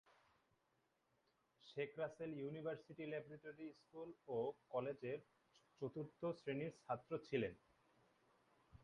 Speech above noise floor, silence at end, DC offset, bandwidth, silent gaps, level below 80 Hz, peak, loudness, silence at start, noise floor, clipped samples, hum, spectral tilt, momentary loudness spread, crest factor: 36 dB; 0 s; under 0.1%; 10.5 kHz; none; -82 dBFS; -28 dBFS; -49 LUFS; 1.65 s; -84 dBFS; under 0.1%; none; -7.5 dB/octave; 11 LU; 22 dB